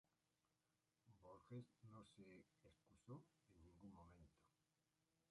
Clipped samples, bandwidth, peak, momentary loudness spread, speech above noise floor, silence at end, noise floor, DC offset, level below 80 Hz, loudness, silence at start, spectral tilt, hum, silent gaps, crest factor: under 0.1%; 10.5 kHz; -48 dBFS; 7 LU; over 26 dB; 0.1 s; under -90 dBFS; under 0.1%; -84 dBFS; -65 LUFS; 0.1 s; -7 dB/octave; none; none; 20 dB